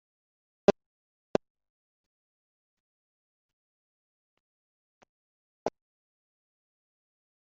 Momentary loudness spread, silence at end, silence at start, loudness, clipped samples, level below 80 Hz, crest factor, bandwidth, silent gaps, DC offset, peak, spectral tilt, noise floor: 12 LU; 1.85 s; 0.7 s; -31 LUFS; under 0.1%; -68 dBFS; 32 dB; 0.6 kHz; 0.86-1.34 s, 1.50-1.55 s, 1.70-5.01 s, 5.09-5.66 s; under 0.1%; -6 dBFS; 5 dB/octave; under -90 dBFS